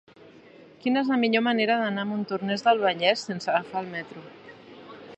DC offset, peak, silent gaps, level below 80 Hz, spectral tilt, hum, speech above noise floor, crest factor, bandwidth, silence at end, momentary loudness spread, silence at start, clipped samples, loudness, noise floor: under 0.1%; -6 dBFS; none; -76 dBFS; -5 dB/octave; none; 26 dB; 20 dB; 8.4 kHz; 0 s; 22 LU; 0.6 s; under 0.1%; -25 LUFS; -51 dBFS